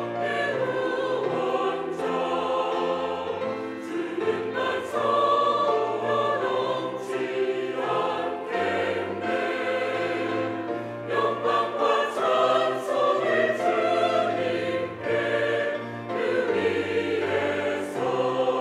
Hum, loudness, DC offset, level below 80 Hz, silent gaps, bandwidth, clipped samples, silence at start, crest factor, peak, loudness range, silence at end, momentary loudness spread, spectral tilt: none; -26 LUFS; under 0.1%; -74 dBFS; none; 13.5 kHz; under 0.1%; 0 s; 14 dB; -10 dBFS; 4 LU; 0 s; 7 LU; -5 dB/octave